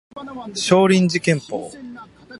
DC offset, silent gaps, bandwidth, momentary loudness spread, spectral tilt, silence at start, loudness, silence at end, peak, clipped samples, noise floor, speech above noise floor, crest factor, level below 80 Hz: under 0.1%; none; 11.5 kHz; 21 LU; -5 dB/octave; 0.15 s; -17 LUFS; 0 s; 0 dBFS; under 0.1%; -39 dBFS; 21 dB; 20 dB; -58 dBFS